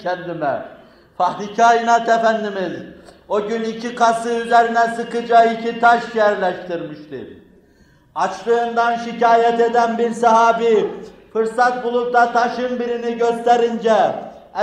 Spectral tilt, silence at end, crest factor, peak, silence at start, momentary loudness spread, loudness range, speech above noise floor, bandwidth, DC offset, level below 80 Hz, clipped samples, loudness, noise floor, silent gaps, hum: -4.5 dB/octave; 0 s; 16 dB; -2 dBFS; 0 s; 13 LU; 3 LU; 35 dB; 10.5 kHz; under 0.1%; -60 dBFS; under 0.1%; -17 LUFS; -52 dBFS; none; none